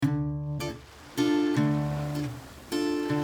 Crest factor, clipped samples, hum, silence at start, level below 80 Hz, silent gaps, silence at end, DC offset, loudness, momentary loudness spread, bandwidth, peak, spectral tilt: 16 dB; under 0.1%; none; 0 s; -50 dBFS; none; 0 s; under 0.1%; -29 LUFS; 12 LU; over 20 kHz; -14 dBFS; -6.5 dB/octave